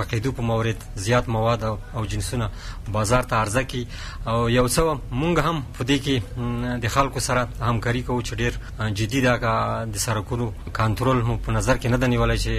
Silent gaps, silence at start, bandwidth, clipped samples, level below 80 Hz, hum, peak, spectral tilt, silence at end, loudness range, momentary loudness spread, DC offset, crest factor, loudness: none; 0 s; 15.5 kHz; under 0.1%; -34 dBFS; none; -6 dBFS; -5 dB/octave; 0 s; 2 LU; 8 LU; under 0.1%; 18 dB; -23 LUFS